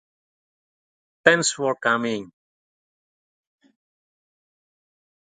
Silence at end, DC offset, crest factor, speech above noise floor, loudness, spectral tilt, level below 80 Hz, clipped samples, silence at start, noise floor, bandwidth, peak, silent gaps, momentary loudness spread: 3.15 s; under 0.1%; 28 dB; over 69 dB; -21 LUFS; -2.5 dB/octave; -72 dBFS; under 0.1%; 1.25 s; under -90 dBFS; 9.6 kHz; 0 dBFS; none; 10 LU